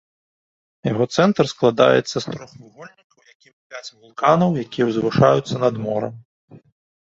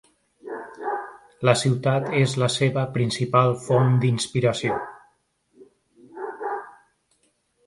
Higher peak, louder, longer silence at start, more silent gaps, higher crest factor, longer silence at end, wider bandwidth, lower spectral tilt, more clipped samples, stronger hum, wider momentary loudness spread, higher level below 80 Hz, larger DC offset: about the same, -2 dBFS vs -4 dBFS; first, -19 LUFS vs -23 LUFS; first, 0.85 s vs 0.45 s; first, 3.04-3.10 s, 3.35-3.40 s, 3.53-3.70 s, 6.25-6.48 s vs none; about the same, 20 dB vs 20 dB; second, 0.45 s vs 0.95 s; second, 8 kHz vs 11.5 kHz; about the same, -6 dB/octave vs -5.5 dB/octave; neither; neither; first, 19 LU vs 16 LU; first, -56 dBFS vs -62 dBFS; neither